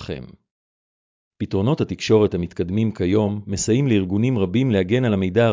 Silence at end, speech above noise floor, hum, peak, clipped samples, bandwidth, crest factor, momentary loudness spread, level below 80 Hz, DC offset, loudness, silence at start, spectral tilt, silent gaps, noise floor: 0 s; over 71 dB; none; -6 dBFS; under 0.1%; 7.6 kHz; 16 dB; 7 LU; -42 dBFS; under 0.1%; -20 LUFS; 0 s; -6.5 dB/octave; 0.51-1.31 s; under -90 dBFS